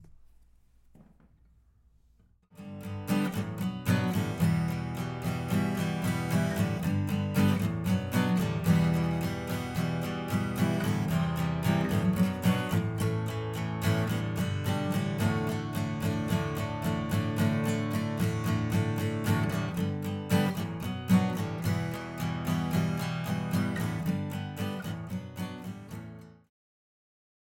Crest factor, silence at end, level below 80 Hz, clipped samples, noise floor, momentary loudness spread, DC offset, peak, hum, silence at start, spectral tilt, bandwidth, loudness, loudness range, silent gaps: 18 dB; 1.2 s; -52 dBFS; under 0.1%; -64 dBFS; 8 LU; under 0.1%; -12 dBFS; none; 0 s; -6.5 dB/octave; 17 kHz; -30 LUFS; 6 LU; none